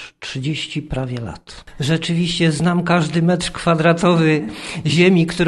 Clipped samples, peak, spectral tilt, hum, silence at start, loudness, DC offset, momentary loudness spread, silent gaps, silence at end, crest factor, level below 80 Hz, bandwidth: under 0.1%; -2 dBFS; -6 dB/octave; none; 0 s; -17 LUFS; under 0.1%; 12 LU; none; 0 s; 16 dB; -42 dBFS; 11.5 kHz